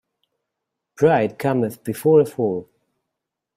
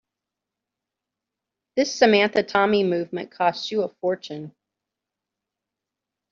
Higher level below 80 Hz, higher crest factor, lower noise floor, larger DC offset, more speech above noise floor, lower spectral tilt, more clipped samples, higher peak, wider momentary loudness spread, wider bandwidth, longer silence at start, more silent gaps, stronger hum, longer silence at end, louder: first, -62 dBFS vs -70 dBFS; about the same, 18 dB vs 22 dB; second, -82 dBFS vs -86 dBFS; neither; about the same, 64 dB vs 64 dB; first, -7.5 dB/octave vs -3 dB/octave; neither; about the same, -4 dBFS vs -4 dBFS; second, 8 LU vs 14 LU; first, 16 kHz vs 7.4 kHz; second, 1 s vs 1.75 s; neither; neither; second, 0.95 s vs 1.8 s; first, -19 LUFS vs -22 LUFS